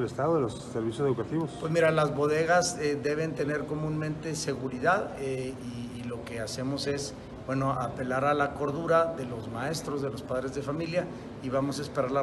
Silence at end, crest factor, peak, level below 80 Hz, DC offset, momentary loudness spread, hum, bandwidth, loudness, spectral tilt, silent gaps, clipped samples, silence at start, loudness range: 0 s; 18 dB; -12 dBFS; -56 dBFS; under 0.1%; 11 LU; none; 12.5 kHz; -30 LUFS; -5.5 dB/octave; none; under 0.1%; 0 s; 5 LU